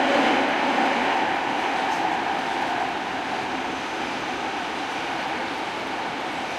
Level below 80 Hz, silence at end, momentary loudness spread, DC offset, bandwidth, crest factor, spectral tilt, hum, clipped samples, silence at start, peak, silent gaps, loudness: -60 dBFS; 0 s; 7 LU; under 0.1%; 14.5 kHz; 18 dB; -3.5 dB/octave; none; under 0.1%; 0 s; -8 dBFS; none; -25 LUFS